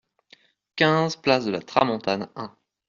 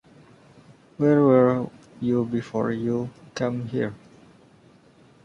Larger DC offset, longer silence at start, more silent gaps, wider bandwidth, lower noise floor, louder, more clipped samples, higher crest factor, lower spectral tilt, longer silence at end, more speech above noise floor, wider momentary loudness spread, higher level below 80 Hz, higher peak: neither; second, 0.75 s vs 1 s; neither; about the same, 7.4 kHz vs 7.6 kHz; first, -58 dBFS vs -54 dBFS; about the same, -23 LUFS vs -23 LUFS; neither; about the same, 22 dB vs 20 dB; second, -3.5 dB/octave vs -8.5 dB/octave; second, 0.4 s vs 1.3 s; about the same, 35 dB vs 32 dB; first, 17 LU vs 13 LU; about the same, -62 dBFS vs -62 dBFS; about the same, -4 dBFS vs -6 dBFS